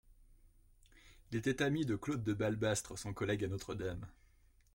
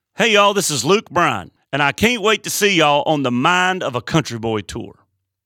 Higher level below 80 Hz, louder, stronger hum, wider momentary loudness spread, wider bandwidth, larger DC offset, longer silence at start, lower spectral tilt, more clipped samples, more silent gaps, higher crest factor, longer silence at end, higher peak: second, -60 dBFS vs -50 dBFS; second, -38 LUFS vs -16 LUFS; neither; about the same, 9 LU vs 10 LU; about the same, 16.5 kHz vs 17.5 kHz; neither; about the same, 0.2 s vs 0.2 s; first, -5.5 dB/octave vs -3.5 dB/octave; neither; neither; about the same, 18 dB vs 16 dB; about the same, 0.65 s vs 0.55 s; second, -22 dBFS vs -2 dBFS